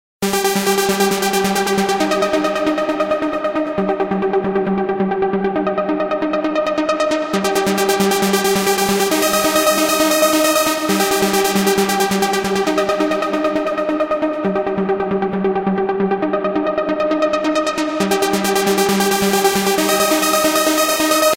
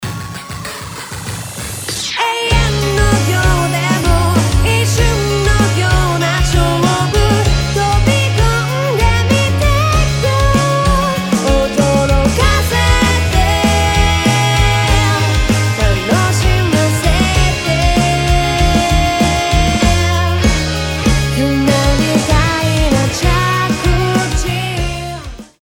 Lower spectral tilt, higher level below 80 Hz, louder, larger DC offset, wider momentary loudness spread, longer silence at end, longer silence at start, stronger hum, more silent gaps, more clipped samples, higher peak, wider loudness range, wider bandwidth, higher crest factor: about the same, -3.5 dB/octave vs -4.5 dB/octave; second, -50 dBFS vs -18 dBFS; second, -16 LUFS vs -13 LUFS; neither; about the same, 5 LU vs 6 LU; second, 0 s vs 0.2 s; first, 0.2 s vs 0 s; neither; neither; neither; about the same, 0 dBFS vs 0 dBFS; about the same, 4 LU vs 2 LU; second, 16.5 kHz vs over 20 kHz; about the same, 16 dB vs 12 dB